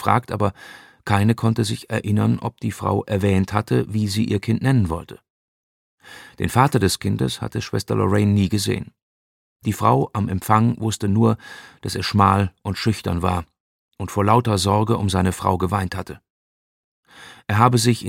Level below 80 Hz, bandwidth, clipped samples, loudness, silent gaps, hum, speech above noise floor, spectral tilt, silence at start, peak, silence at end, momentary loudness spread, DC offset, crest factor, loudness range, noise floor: -46 dBFS; 16.5 kHz; under 0.1%; -20 LUFS; 5.30-5.98 s, 9.02-9.60 s, 13.60-13.89 s, 16.30-17.03 s; none; over 70 dB; -6 dB/octave; 0 s; 0 dBFS; 0 s; 11 LU; under 0.1%; 20 dB; 2 LU; under -90 dBFS